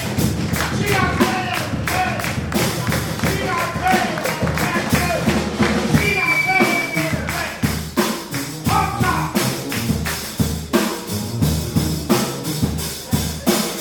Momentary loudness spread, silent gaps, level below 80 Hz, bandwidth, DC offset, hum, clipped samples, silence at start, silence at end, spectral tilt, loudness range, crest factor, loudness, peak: 6 LU; none; -34 dBFS; 19 kHz; under 0.1%; none; under 0.1%; 0 s; 0 s; -4.5 dB/octave; 3 LU; 16 dB; -19 LUFS; -4 dBFS